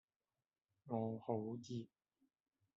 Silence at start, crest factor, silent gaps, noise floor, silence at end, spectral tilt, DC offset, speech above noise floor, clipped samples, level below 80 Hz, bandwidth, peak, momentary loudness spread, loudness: 0.85 s; 22 dB; none; under -90 dBFS; 0.9 s; -9 dB/octave; under 0.1%; over 46 dB; under 0.1%; -86 dBFS; 7.6 kHz; -26 dBFS; 7 LU; -46 LUFS